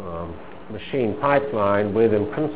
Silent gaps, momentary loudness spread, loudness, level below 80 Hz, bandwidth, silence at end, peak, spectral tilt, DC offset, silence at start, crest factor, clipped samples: none; 16 LU; -21 LUFS; -48 dBFS; 4 kHz; 0 s; -4 dBFS; -11 dB/octave; 1%; 0 s; 18 dB; under 0.1%